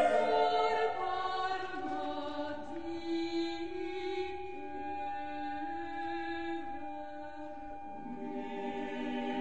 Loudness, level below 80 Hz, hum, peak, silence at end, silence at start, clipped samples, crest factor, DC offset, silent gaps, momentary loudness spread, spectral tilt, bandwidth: -37 LUFS; -64 dBFS; none; -16 dBFS; 0 s; 0 s; under 0.1%; 20 dB; 0.5%; none; 14 LU; -5 dB/octave; 9 kHz